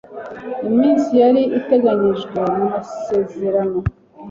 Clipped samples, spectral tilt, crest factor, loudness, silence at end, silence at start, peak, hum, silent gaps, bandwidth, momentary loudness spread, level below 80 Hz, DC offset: under 0.1%; -8 dB/octave; 14 dB; -17 LUFS; 0 s; 0.1 s; -4 dBFS; none; none; 7.4 kHz; 12 LU; -42 dBFS; under 0.1%